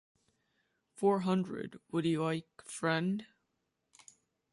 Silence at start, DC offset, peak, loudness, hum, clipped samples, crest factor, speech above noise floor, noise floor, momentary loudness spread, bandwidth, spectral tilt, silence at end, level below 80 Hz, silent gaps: 1 s; under 0.1%; -18 dBFS; -34 LUFS; none; under 0.1%; 18 dB; 49 dB; -83 dBFS; 10 LU; 11.5 kHz; -6 dB/octave; 1.3 s; -76 dBFS; none